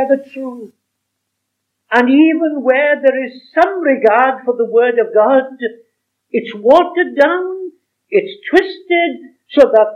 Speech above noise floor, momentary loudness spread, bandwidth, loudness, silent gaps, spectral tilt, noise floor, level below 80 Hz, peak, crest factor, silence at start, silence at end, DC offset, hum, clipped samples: 60 dB; 14 LU; 8 kHz; -13 LUFS; none; -5.5 dB/octave; -73 dBFS; -58 dBFS; 0 dBFS; 14 dB; 0 s; 0 s; under 0.1%; none; 0.3%